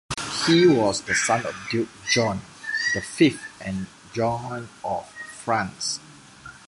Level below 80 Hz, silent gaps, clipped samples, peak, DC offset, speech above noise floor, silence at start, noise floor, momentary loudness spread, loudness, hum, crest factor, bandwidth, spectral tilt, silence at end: -54 dBFS; none; under 0.1%; -4 dBFS; under 0.1%; 22 dB; 0.1 s; -45 dBFS; 15 LU; -24 LUFS; none; 20 dB; 11.5 kHz; -4 dB/octave; 0.1 s